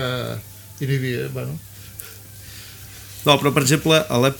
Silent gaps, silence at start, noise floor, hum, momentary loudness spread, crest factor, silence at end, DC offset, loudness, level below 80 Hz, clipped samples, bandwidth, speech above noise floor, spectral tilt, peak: none; 0 s; -39 dBFS; none; 22 LU; 22 dB; 0 s; under 0.1%; -20 LUFS; -50 dBFS; under 0.1%; 19 kHz; 21 dB; -4.5 dB/octave; 0 dBFS